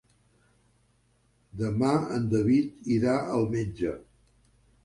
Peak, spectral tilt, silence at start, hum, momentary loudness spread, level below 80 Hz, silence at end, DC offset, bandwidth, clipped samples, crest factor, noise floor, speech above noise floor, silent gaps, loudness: -12 dBFS; -7.5 dB/octave; 1.55 s; 50 Hz at -50 dBFS; 9 LU; -54 dBFS; 0.85 s; under 0.1%; 11.5 kHz; under 0.1%; 18 dB; -67 dBFS; 41 dB; none; -27 LUFS